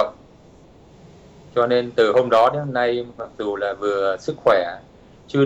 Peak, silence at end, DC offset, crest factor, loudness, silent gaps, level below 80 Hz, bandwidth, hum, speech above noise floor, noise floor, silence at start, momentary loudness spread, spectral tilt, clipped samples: -6 dBFS; 0 s; under 0.1%; 16 dB; -20 LUFS; none; -56 dBFS; 8.2 kHz; none; 28 dB; -48 dBFS; 0 s; 11 LU; -6.5 dB/octave; under 0.1%